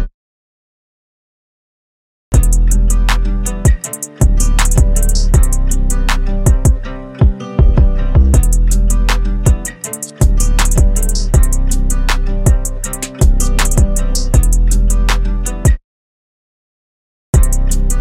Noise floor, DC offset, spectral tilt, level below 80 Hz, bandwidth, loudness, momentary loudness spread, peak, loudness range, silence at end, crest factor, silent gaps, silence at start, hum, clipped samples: under -90 dBFS; under 0.1%; -5 dB/octave; -12 dBFS; 16 kHz; -15 LUFS; 5 LU; 0 dBFS; 3 LU; 0 s; 12 dB; 0.14-2.32 s, 15.84-17.33 s; 0 s; none; under 0.1%